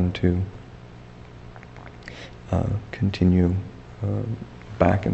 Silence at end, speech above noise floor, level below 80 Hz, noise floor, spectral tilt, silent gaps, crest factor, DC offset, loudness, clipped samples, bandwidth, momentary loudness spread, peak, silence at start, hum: 0 s; 21 dB; -42 dBFS; -43 dBFS; -8.5 dB/octave; none; 24 dB; under 0.1%; -24 LUFS; under 0.1%; 8 kHz; 23 LU; -2 dBFS; 0 s; none